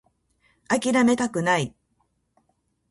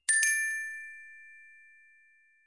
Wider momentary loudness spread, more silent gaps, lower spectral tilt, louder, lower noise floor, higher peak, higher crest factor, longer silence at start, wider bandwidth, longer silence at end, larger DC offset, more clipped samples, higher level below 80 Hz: second, 6 LU vs 26 LU; neither; first, -4.5 dB/octave vs 7.5 dB/octave; first, -23 LUFS vs -28 LUFS; first, -71 dBFS vs -64 dBFS; first, -8 dBFS vs -12 dBFS; about the same, 18 dB vs 22 dB; first, 0.7 s vs 0.1 s; about the same, 11.5 kHz vs 11.5 kHz; first, 1.2 s vs 1.05 s; neither; neither; first, -62 dBFS vs under -90 dBFS